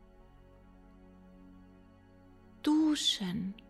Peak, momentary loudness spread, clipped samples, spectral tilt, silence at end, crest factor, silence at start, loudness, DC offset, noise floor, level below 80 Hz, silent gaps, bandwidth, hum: -18 dBFS; 9 LU; under 0.1%; -4 dB/octave; 0.15 s; 18 dB; 0.2 s; -30 LUFS; under 0.1%; -59 dBFS; -62 dBFS; none; 13 kHz; none